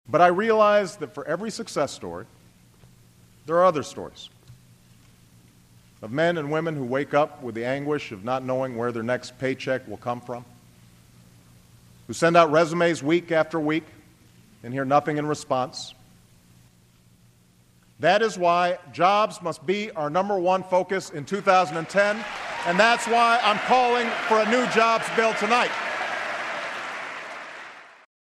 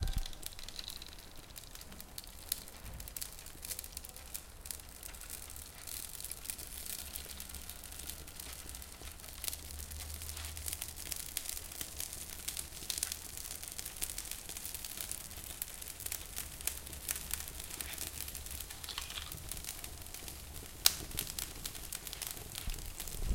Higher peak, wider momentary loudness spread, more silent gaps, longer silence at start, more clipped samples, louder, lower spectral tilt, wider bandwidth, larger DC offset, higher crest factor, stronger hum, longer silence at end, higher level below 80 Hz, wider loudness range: about the same, -2 dBFS vs 0 dBFS; first, 16 LU vs 8 LU; neither; about the same, 0.1 s vs 0 s; neither; first, -23 LUFS vs -41 LUFS; first, -4.5 dB/octave vs -1 dB/octave; second, 14.5 kHz vs 17 kHz; neither; second, 22 dB vs 42 dB; neither; first, 0.35 s vs 0 s; second, -64 dBFS vs -50 dBFS; about the same, 8 LU vs 7 LU